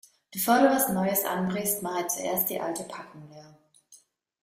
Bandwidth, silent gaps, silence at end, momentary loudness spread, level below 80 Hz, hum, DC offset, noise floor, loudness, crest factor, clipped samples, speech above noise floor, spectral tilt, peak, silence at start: 16 kHz; none; 0.45 s; 19 LU; -68 dBFS; none; under 0.1%; -59 dBFS; -26 LUFS; 20 dB; under 0.1%; 32 dB; -4 dB/octave; -8 dBFS; 0.3 s